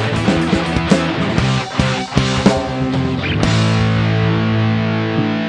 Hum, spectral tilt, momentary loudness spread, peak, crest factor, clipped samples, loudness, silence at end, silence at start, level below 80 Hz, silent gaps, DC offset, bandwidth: none; -6 dB/octave; 4 LU; 0 dBFS; 16 dB; under 0.1%; -16 LUFS; 0 s; 0 s; -32 dBFS; none; under 0.1%; 10 kHz